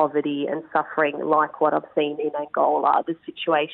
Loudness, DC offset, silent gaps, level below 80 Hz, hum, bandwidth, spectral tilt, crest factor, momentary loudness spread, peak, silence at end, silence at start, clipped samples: -23 LUFS; under 0.1%; none; -72 dBFS; none; 4.2 kHz; -9.5 dB/octave; 16 dB; 7 LU; -6 dBFS; 0 s; 0 s; under 0.1%